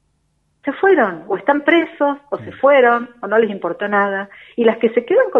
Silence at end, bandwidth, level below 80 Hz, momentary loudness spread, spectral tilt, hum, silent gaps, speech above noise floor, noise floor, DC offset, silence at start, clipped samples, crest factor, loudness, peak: 0 s; 4 kHz; -66 dBFS; 13 LU; -7.5 dB/octave; none; none; 49 dB; -64 dBFS; under 0.1%; 0.65 s; under 0.1%; 16 dB; -16 LUFS; 0 dBFS